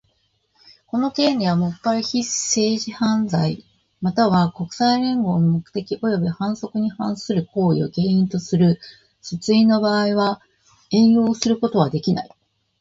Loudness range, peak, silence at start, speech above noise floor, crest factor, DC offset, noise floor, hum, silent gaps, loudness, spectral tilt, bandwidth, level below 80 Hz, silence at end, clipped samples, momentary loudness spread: 3 LU; -2 dBFS; 0.95 s; 47 dB; 18 dB; under 0.1%; -66 dBFS; none; none; -20 LUFS; -5.5 dB/octave; 7.8 kHz; -56 dBFS; 0.55 s; under 0.1%; 9 LU